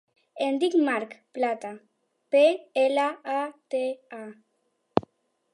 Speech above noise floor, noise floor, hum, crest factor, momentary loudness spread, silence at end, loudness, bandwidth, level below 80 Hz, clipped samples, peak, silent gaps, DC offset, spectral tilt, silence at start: 48 dB; -74 dBFS; none; 26 dB; 17 LU; 0.55 s; -26 LUFS; 11.5 kHz; -70 dBFS; under 0.1%; -2 dBFS; none; under 0.1%; -5 dB/octave; 0.35 s